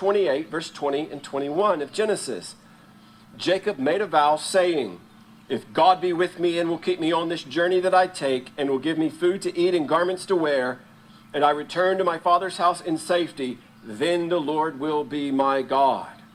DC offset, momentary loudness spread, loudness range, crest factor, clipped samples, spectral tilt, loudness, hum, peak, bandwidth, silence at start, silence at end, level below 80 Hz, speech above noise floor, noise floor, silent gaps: under 0.1%; 10 LU; 3 LU; 18 dB; under 0.1%; -4.5 dB/octave; -23 LUFS; none; -4 dBFS; 13.5 kHz; 0 s; 0.2 s; -68 dBFS; 27 dB; -50 dBFS; none